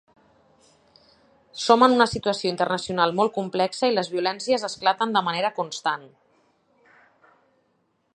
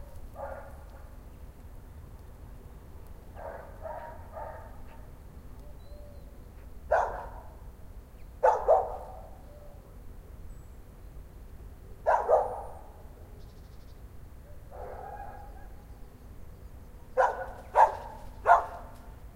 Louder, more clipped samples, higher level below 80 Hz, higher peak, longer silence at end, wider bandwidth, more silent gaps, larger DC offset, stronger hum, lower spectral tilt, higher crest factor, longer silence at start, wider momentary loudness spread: first, -23 LUFS vs -29 LUFS; neither; second, -60 dBFS vs -48 dBFS; first, -2 dBFS vs -6 dBFS; first, 2.1 s vs 0 s; second, 11 kHz vs 16 kHz; neither; neither; neither; second, -4 dB/octave vs -6 dB/octave; about the same, 24 dB vs 26 dB; first, 1.55 s vs 0 s; second, 10 LU vs 26 LU